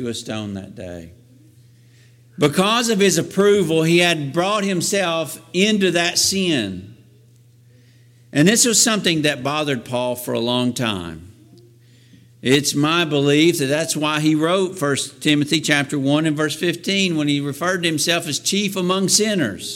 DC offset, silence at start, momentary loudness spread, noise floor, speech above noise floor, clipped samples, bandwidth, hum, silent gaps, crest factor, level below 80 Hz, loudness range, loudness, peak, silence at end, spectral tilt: under 0.1%; 0 s; 9 LU; -50 dBFS; 32 dB; under 0.1%; 17 kHz; none; none; 18 dB; -60 dBFS; 4 LU; -18 LUFS; -2 dBFS; 0 s; -3.5 dB/octave